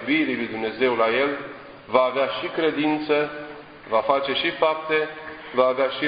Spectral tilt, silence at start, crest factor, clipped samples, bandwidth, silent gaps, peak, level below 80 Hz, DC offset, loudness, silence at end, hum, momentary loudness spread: -8.5 dB/octave; 0 s; 18 dB; under 0.1%; 5.2 kHz; none; -4 dBFS; -62 dBFS; under 0.1%; -23 LUFS; 0 s; none; 14 LU